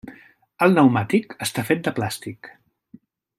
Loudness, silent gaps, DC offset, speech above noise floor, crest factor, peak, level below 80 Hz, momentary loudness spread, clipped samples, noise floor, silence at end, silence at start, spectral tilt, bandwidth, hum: -21 LUFS; none; under 0.1%; 31 dB; 20 dB; -2 dBFS; -62 dBFS; 17 LU; under 0.1%; -51 dBFS; 0.9 s; 0.05 s; -5.5 dB/octave; 16 kHz; none